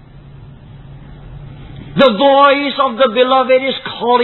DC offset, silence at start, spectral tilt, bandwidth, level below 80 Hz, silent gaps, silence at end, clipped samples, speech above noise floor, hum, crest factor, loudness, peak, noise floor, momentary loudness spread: under 0.1%; 0.25 s; -7 dB/octave; 4.3 kHz; -42 dBFS; none; 0 s; under 0.1%; 25 dB; none; 14 dB; -12 LUFS; 0 dBFS; -36 dBFS; 24 LU